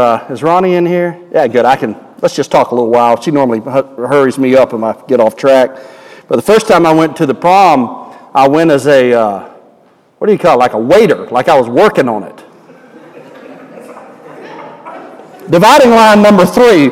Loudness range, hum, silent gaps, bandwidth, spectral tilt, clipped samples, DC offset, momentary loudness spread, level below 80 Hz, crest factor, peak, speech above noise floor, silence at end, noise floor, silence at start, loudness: 5 LU; none; none; 17 kHz; -5.5 dB/octave; 0.5%; under 0.1%; 13 LU; -48 dBFS; 10 dB; 0 dBFS; 38 dB; 0 s; -47 dBFS; 0 s; -9 LUFS